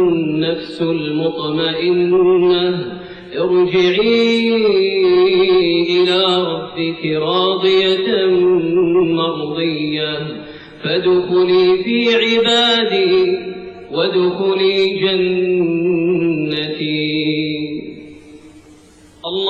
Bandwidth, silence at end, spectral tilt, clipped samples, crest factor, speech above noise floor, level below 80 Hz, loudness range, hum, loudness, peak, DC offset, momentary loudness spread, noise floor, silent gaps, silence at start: 8.2 kHz; 0 s; -6 dB/octave; under 0.1%; 12 dB; 30 dB; -52 dBFS; 3 LU; none; -15 LUFS; -4 dBFS; under 0.1%; 10 LU; -44 dBFS; none; 0 s